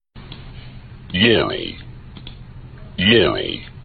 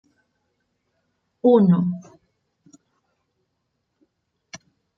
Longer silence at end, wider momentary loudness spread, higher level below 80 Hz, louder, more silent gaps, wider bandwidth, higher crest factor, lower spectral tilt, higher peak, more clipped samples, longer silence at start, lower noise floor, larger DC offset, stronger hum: second, 0 s vs 0.4 s; about the same, 25 LU vs 27 LU; first, -42 dBFS vs -72 dBFS; about the same, -17 LUFS vs -18 LUFS; neither; second, 4.8 kHz vs 6.6 kHz; about the same, 20 dB vs 20 dB; about the same, -9 dB/octave vs -9 dB/octave; about the same, -2 dBFS vs -4 dBFS; neither; second, 0.15 s vs 1.45 s; second, -37 dBFS vs -75 dBFS; neither; neither